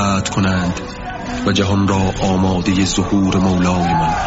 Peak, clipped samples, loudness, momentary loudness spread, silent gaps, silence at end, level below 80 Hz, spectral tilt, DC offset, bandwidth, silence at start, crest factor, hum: -4 dBFS; under 0.1%; -16 LUFS; 7 LU; none; 0 s; -34 dBFS; -5.5 dB/octave; under 0.1%; 8 kHz; 0 s; 12 dB; none